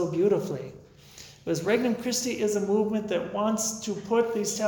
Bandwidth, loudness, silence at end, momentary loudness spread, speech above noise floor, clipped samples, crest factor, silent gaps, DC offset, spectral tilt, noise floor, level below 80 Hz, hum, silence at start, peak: 19 kHz; -27 LUFS; 0 s; 12 LU; 22 dB; under 0.1%; 16 dB; none; under 0.1%; -4 dB/octave; -49 dBFS; -64 dBFS; none; 0 s; -12 dBFS